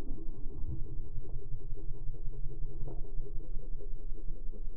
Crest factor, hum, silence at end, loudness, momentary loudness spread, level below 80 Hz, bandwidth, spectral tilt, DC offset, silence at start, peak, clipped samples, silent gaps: 10 dB; none; 0 s; -46 LUFS; 4 LU; -36 dBFS; 1 kHz; -13 dB/octave; under 0.1%; 0 s; -18 dBFS; under 0.1%; none